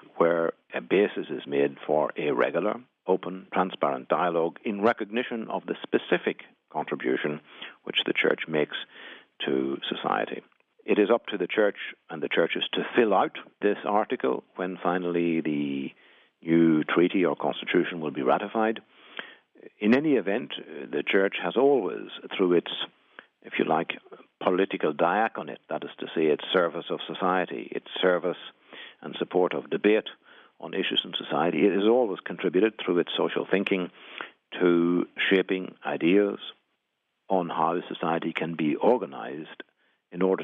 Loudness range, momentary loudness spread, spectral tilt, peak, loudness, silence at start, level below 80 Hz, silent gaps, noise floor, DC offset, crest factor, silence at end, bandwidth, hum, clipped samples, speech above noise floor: 3 LU; 14 LU; -8 dB/octave; -8 dBFS; -27 LUFS; 0.15 s; -82 dBFS; none; -79 dBFS; under 0.1%; 20 dB; 0 s; 5.2 kHz; none; under 0.1%; 53 dB